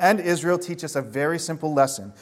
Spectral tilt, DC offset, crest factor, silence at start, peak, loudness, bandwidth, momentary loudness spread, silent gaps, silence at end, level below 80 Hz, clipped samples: -4.5 dB/octave; under 0.1%; 18 dB; 0 s; -4 dBFS; -24 LUFS; 16.5 kHz; 7 LU; none; 0.1 s; -68 dBFS; under 0.1%